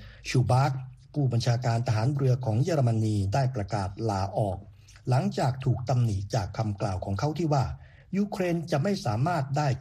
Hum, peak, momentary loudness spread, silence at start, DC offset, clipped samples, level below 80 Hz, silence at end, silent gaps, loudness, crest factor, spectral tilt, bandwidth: none; -12 dBFS; 6 LU; 0 s; under 0.1%; under 0.1%; -52 dBFS; 0 s; none; -28 LUFS; 14 dB; -7 dB/octave; 11 kHz